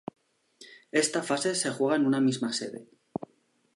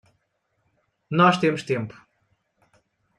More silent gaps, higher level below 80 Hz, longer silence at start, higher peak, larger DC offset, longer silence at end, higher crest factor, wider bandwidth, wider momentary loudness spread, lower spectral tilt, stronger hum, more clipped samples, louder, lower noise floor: neither; second, -76 dBFS vs -68 dBFS; second, 0.6 s vs 1.1 s; second, -12 dBFS vs -4 dBFS; neither; second, 0.95 s vs 1.25 s; about the same, 18 dB vs 22 dB; about the same, 11.5 kHz vs 11 kHz; first, 17 LU vs 11 LU; second, -3.5 dB/octave vs -6.5 dB/octave; neither; neither; second, -27 LUFS vs -21 LUFS; second, -68 dBFS vs -73 dBFS